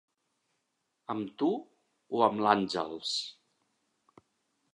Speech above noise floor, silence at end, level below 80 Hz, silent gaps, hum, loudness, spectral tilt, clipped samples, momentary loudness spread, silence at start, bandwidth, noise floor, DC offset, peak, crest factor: 51 dB; 1.4 s; -76 dBFS; none; none; -31 LUFS; -4.5 dB/octave; under 0.1%; 12 LU; 1.1 s; 11.5 kHz; -81 dBFS; under 0.1%; -8 dBFS; 26 dB